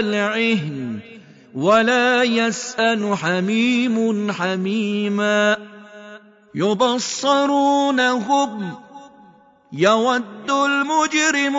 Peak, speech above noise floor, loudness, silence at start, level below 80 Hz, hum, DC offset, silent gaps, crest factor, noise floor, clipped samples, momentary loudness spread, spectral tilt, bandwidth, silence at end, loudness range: -4 dBFS; 32 dB; -18 LUFS; 0 s; -68 dBFS; none; under 0.1%; none; 14 dB; -50 dBFS; under 0.1%; 12 LU; -4 dB/octave; 7.8 kHz; 0 s; 2 LU